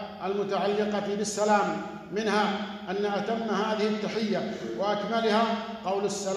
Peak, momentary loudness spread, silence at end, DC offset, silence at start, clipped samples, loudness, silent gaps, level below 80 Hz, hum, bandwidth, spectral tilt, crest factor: -10 dBFS; 7 LU; 0 s; under 0.1%; 0 s; under 0.1%; -28 LUFS; none; -66 dBFS; none; 12.5 kHz; -4.5 dB/octave; 18 dB